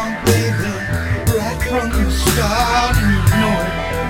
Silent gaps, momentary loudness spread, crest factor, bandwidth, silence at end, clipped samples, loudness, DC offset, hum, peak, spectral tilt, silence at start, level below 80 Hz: none; 6 LU; 16 dB; 17 kHz; 0 s; under 0.1%; -16 LUFS; 0.2%; none; 0 dBFS; -5 dB/octave; 0 s; -24 dBFS